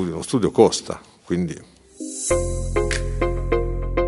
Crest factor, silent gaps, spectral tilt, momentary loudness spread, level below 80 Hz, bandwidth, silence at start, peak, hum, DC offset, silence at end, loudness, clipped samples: 20 dB; none; -5 dB/octave; 16 LU; -30 dBFS; 11.5 kHz; 0 s; 0 dBFS; none; under 0.1%; 0 s; -22 LUFS; under 0.1%